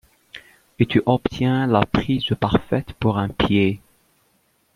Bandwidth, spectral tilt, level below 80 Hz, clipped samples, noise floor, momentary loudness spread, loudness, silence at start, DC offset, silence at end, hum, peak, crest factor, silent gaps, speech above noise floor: 14 kHz; -8 dB/octave; -42 dBFS; under 0.1%; -64 dBFS; 19 LU; -20 LUFS; 0.35 s; under 0.1%; 1 s; none; -2 dBFS; 20 dB; none; 44 dB